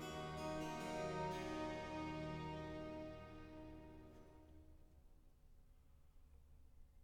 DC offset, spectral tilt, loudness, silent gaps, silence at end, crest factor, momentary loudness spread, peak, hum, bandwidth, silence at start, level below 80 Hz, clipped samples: under 0.1%; -5.5 dB/octave; -48 LUFS; none; 0 s; 16 dB; 20 LU; -34 dBFS; none; 17.5 kHz; 0 s; -64 dBFS; under 0.1%